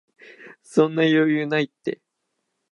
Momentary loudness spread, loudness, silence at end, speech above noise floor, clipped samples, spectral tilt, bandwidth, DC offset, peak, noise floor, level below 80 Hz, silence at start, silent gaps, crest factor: 13 LU; -21 LUFS; 0.8 s; 56 dB; under 0.1%; -6.5 dB/octave; 11 kHz; under 0.1%; -4 dBFS; -77 dBFS; -80 dBFS; 0.4 s; none; 18 dB